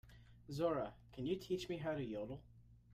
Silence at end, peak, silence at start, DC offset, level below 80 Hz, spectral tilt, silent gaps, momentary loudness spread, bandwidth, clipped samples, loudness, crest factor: 0 s; -26 dBFS; 0.05 s; under 0.1%; -66 dBFS; -6.5 dB/octave; none; 14 LU; 15.5 kHz; under 0.1%; -43 LUFS; 18 dB